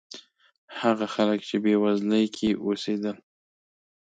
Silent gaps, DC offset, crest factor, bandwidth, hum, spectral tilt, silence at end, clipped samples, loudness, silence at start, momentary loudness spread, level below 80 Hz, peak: 0.58-0.68 s; under 0.1%; 18 dB; 9 kHz; none; -6 dB/octave; 0.9 s; under 0.1%; -25 LUFS; 0.15 s; 18 LU; -64 dBFS; -8 dBFS